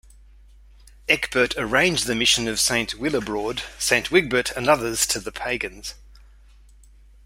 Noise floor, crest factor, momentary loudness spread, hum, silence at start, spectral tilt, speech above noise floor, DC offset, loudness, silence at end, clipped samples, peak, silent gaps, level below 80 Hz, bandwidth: -50 dBFS; 22 dB; 9 LU; none; 1.1 s; -2 dB/octave; 27 dB; under 0.1%; -21 LUFS; 1.1 s; under 0.1%; -2 dBFS; none; -46 dBFS; 16 kHz